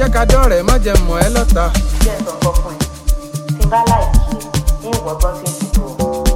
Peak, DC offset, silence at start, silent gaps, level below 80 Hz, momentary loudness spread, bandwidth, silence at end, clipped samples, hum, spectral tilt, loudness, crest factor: 0 dBFS; under 0.1%; 0 s; none; -14 dBFS; 9 LU; 16.5 kHz; 0 s; under 0.1%; none; -5 dB/octave; -16 LUFS; 12 dB